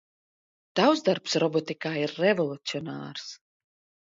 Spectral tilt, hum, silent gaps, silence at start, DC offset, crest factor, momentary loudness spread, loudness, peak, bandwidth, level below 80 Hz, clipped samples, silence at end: -5 dB/octave; none; none; 0.75 s; under 0.1%; 20 dB; 14 LU; -27 LUFS; -8 dBFS; 7.8 kHz; -74 dBFS; under 0.1%; 0.7 s